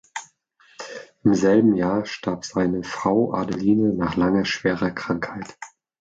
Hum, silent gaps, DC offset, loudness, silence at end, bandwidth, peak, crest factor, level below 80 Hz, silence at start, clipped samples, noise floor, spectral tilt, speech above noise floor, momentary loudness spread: none; none; under 0.1%; -22 LUFS; 0.35 s; 8 kHz; -6 dBFS; 16 dB; -52 dBFS; 0.15 s; under 0.1%; -58 dBFS; -6 dB/octave; 37 dB; 19 LU